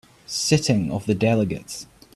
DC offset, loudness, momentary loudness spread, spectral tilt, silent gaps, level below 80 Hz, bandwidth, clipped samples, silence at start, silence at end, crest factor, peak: under 0.1%; -22 LUFS; 13 LU; -5 dB/octave; none; -50 dBFS; 14.5 kHz; under 0.1%; 0.3 s; 0.3 s; 18 dB; -4 dBFS